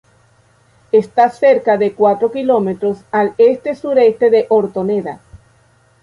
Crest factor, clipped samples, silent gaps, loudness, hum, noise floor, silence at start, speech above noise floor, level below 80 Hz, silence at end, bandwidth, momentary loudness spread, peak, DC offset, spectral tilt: 12 dB; under 0.1%; none; -14 LUFS; none; -53 dBFS; 0.95 s; 39 dB; -56 dBFS; 0.65 s; 10.5 kHz; 8 LU; -2 dBFS; under 0.1%; -7.5 dB/octave